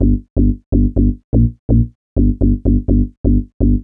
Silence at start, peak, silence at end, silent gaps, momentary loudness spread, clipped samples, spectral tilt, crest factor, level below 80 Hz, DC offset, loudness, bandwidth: 0 s; 0 dBFS; 0 s; 0.30-0.36 s, 0.66-0.72 s, 1.24-1.33 s, 1.59-1.69 s, 1.95-2.16 s, 3.17-3.24 s, 3.54-3.60 s; 2 LU; under 0.1%; -16.5 dB/octave; 12 dB; -18 dBFS; under 0.1%; -16 LUFS; 1.1 kHz